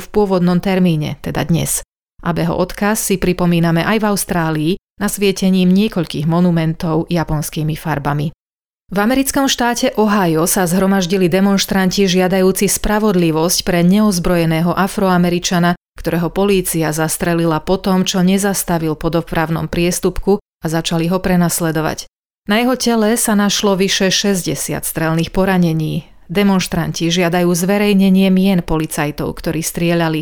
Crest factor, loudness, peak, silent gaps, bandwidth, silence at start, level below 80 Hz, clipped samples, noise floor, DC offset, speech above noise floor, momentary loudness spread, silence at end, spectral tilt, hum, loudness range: 12 dB; -15 LUFS; -4 dBFS; 2.03-2.07 s, 4.90-4.94 s, 8.40-8.46 s, 8.66-8.70 s, 15.77-15.85 s, 20.42-20.52 s, 22.19-22.30 s, 22.38-22.42 s; over 20 kHz; 0 s; -36 dBFS; under 0.1%; under -90 dBFS; under 0.1%; over 76 dB; 6 LU; 0 s; -5 dB/octave; none; 3 LU